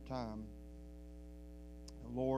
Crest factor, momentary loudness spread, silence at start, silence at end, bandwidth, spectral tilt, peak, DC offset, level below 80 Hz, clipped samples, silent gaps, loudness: 20 dB; 11 LU; 0 s; 0 s; 15 kHz; -7.5 dB/octave; -24 dBFS; under 0.1%; -54 dBFS; under 0.1%; none; -49 LUFS